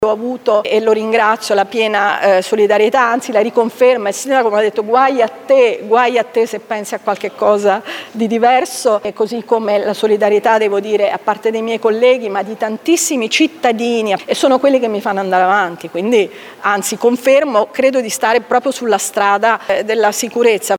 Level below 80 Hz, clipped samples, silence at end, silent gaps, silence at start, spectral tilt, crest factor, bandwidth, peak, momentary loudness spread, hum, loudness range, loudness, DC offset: -64 dBFS; under 0.1%; 0 s; none; 0 s; -3 dB/octave; 14 dB; 17.5 kHz; 0 dBFS; 6 LU; none; 2 LU; -14 LUFS; under 0.1%